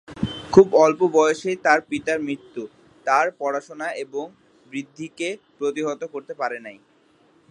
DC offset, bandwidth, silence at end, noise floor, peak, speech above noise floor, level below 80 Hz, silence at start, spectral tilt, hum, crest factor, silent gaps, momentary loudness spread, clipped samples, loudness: under 0.1%; 10.5 kHz; 0.8 s; -58 dBFS; 0 dBFS; 37 dB; -56 dBFS; 0.1 s; -5 dB/octave; none; 22 dB; none; 19 LU; under 0.1%; -21 LUFS